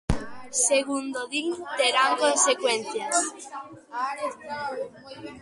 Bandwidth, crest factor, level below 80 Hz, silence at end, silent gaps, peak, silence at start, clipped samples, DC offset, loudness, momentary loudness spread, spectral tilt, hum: 11.5 kHz; 20 dB; -46 dBFS; 0 s; none; -6 dBFS; 0.1 s; under 0.1%; under 0.1%; -25 LUFS; 17 LU; -2 dB/octave; none